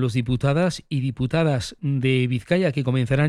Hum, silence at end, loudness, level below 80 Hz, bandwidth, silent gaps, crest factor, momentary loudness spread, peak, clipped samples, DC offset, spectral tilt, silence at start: none; 0 s; -22 LUFS; -46 dBFS; 11 kHz; none; 16 dB; 5 LU; -6 dBFS; under 0.1%; under 0.1%; -7 dB/octave; 0 s